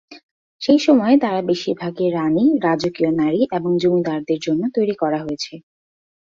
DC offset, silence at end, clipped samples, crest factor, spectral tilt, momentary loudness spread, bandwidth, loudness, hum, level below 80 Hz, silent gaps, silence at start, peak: under 0.1%; 0.7 s; under 0.1%; 16 dB; -6.5 dB/octave; 9 LU; 7.6 kHz; -18 LUFS; none; -60 dBFS; 0.23-0.59 s; 0.1 s; -2 dBFS